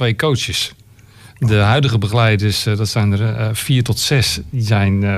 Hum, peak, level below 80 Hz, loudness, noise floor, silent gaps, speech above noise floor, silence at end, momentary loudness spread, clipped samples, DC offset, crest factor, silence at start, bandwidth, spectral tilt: none; -4 dBFS; -40 dBFS; -16 LUFS; -43 dBFS; none; 28 dB; 0 s; 6 LU; under 0.1%; under 0.1%; 12 dB; 0 s; 15 kHz; -5 dB/octave